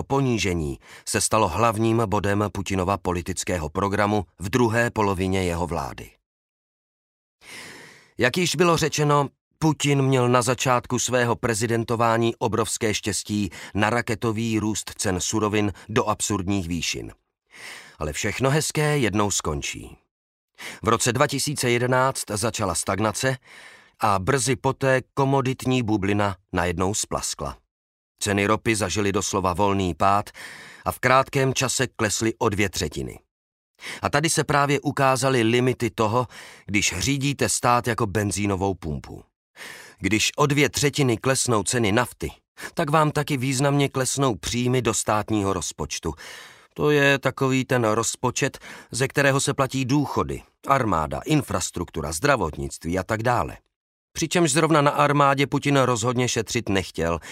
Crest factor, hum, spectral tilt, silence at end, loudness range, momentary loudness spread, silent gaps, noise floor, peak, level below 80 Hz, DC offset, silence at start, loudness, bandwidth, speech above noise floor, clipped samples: 20 dB; none; -4.5 dB/octave; 0 s; 3 LU; 12 LU; 6.26-7.39 s, 9.41-9.51 s, 20.11-20.48 s, 27.71-28.15 s, 33.31-33.74 s, 39.36-39.54 s, 42.48-42.55 s, 53.76-54.08 s; -46 dBFS; -2 dBFS; -46 dBFS; under 0.1%; 0 s; -23 LUFS; 16 kHz; 23 dB; under 0.1%